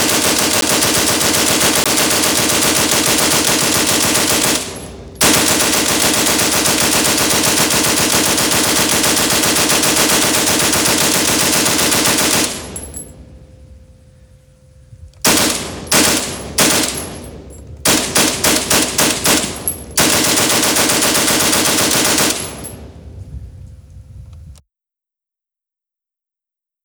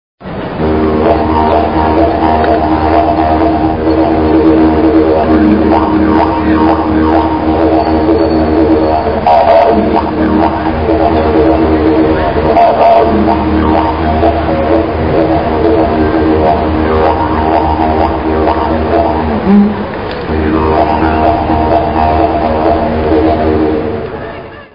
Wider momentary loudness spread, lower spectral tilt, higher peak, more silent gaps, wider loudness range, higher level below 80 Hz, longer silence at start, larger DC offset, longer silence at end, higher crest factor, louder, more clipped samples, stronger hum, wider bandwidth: first, 8 LU vs 4 LU; second, -1.5 dB/octave vs -10 dB/octave; about the same, 0 dBFS vs 0 dBFS; neither; first, 6 LU vs 2 LU; second, -40 dBFS vs -24 dBFS; second, 0 s vs 0.2 s; second, under 0.1% vs 1%; first, 2.3 s vs 0.1 s; first, 16 dB vs 10 dB; about the same, -12 LUFS vs -10 LUFS; second, under 0.1% vs 0.5%; neither; first, over 20 kHz vs 5.4 kHz